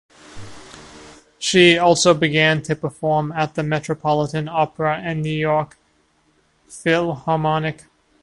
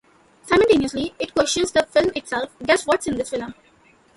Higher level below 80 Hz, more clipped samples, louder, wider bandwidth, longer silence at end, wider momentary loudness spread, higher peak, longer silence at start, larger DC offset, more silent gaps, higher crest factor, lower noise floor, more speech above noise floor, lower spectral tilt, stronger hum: about the same, -52 dBFS vs -50 dBFS; neither; about the same, -18 LUFS vs -20 LUFS; about the same, 11.5 kHz vs 11.5 kHz; second, 0.5 s vs 0.65 s; first, 23 LU vs 10 LU; about the same, 0 dBFS vs -2 dBFS; second, 0.3 s vs 0.45 s; neither; neither; about the same, 20 dB vs 18 dB; first, -61 dBFS vs -55 dBFS; first, 43 dB vs 34 dB; about the same, -4.5 dB/octave vs -3.5 dB/octave; neither